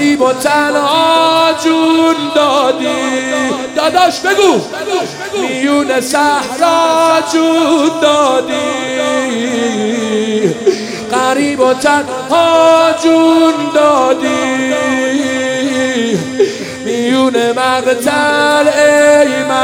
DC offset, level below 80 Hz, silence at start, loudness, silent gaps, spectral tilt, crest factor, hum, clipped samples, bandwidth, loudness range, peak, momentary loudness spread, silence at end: under 0.1%; -56 dBFS; 0 s; -11 LUFS; none; -3.5 dB/octave; 12 dB; none; 0.2%; 17 kHz; 3 LU; 0 dBFS; 7 LU; 0 s